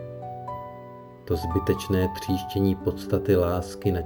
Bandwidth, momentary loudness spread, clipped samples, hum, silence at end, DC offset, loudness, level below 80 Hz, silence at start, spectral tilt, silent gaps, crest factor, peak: over 20 kHz; 16 LU; under 0.1%; none; 0 s; under 0.1%; -26 LUFS; -48 dBFS; 0 s; -7 dB/octave; none; 18 dB; -8 dBFS